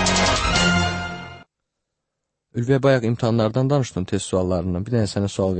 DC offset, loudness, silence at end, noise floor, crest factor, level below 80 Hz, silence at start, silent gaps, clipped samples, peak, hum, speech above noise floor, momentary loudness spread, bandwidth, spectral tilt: under 0.1%; -20 LUFS; 0 s; -80 dBFS; 16 dB; -38 dBFS; 0 s; none; under 0.1%; -4 dBFS; none; 60 dB; 11 LU; 8.8 kHz; -5 dB/octave